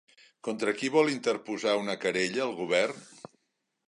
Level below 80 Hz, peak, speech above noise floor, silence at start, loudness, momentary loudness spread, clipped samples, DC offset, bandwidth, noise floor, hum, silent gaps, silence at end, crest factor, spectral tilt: -76 dBFS; -10 dBFS; 51 dB; 0.45 s; -29 LUFS; 12 LU; under 0.1%; under 0.1%; 11 kHz; -80 dBFS; none; none; 0.8 s; 20 dB; -4 dB/octave